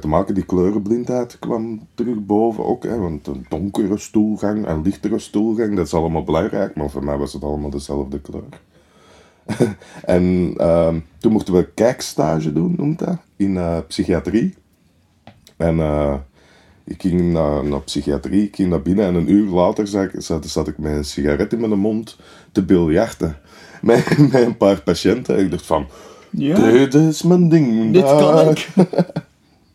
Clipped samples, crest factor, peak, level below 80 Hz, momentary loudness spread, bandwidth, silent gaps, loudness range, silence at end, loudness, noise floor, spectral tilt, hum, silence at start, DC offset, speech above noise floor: under 0.1%; 18 dB; 0 dBFS; -38 dBFS; 11 LU; 14 kHz; none; 8 LU; 0.5 s; -18 LUFS; -57 dBFS; -7 dB/octave; none; 0 s; under 0.1%; 40 dB